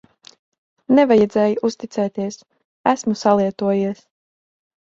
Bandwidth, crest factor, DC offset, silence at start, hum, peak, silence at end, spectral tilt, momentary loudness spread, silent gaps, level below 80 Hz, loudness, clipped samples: 7.8 kHz; 20 dB; under 0.1%; 0.9 s; none; 0 dBFS; 0.9 s; -6 dB/octave; 13 LU; 2.65-2.84 s; -60 dBFS; -19 LUFS; under 0.1%